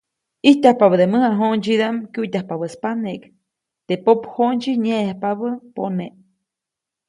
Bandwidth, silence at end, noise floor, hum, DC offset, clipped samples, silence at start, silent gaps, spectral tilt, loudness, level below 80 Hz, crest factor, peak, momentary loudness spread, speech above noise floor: 11 kHz; 1 s; -85 dBFS; none; under 0.1%; under 0.1%; 0.45 s; none; -6.5 dB/octave; -19 LUFS; -66 dBFS; 18 dB; 0 dBFS; 13 LU; 67 dB